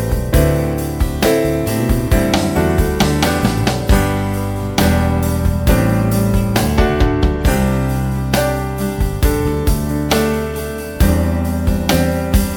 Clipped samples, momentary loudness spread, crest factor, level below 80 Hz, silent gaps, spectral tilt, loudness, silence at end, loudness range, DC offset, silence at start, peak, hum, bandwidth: under 0.1%; 5 LU; 14 dB; -20 dBFS; none; -6 dB/octave; -16 LUFS; 0 s; 2 LU; under 0.1%; 0 s; 0 dBFS; none; 19.5 kHz